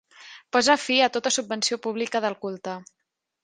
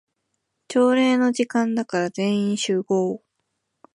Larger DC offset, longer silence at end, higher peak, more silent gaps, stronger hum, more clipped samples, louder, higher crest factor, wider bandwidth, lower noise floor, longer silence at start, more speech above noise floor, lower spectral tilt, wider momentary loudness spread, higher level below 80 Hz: neither; second, 0.6 s vs 0.75 s; first, -4 dBFS vs -8 dBFS; neither; neither; neither; about the same, -23 LUFS vs -21 LUFS; first, 22 dB vs 14 dB; second, 10 kHz vs 11.5 kHz; second, -47 dBFS vs -76 dBFS; second, 0.2 s vs 0.7 s; second, 22 dB vs 56 dB; second, -1.5 dB/octave vs -5 dB/octave; first, 14 LU vs 8 LU; about the same, -72 dBFS vs -74 dBFS